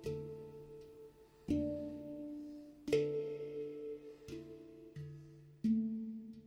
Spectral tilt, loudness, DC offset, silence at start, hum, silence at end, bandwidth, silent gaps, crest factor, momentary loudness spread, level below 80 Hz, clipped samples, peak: -7.5 dB/octave; -42 LUFS; under 0.1%; 0 s; none; 0 s; 15 kHz; none; 22 dB; 19 LU; -66 dBFS; under 0.1%; -20 dBFS